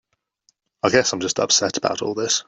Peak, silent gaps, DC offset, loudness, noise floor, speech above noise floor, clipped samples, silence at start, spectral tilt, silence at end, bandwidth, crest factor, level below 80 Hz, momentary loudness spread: -2 dBFS; none; under 0.1%; -20 LUFS; -66 dBFS; 45 dB; under 0.1%; 0.85 s; -2 dB/octave; 0.05 s; 8.4 kHz; 20 dB; -60 dBFS; 6 LU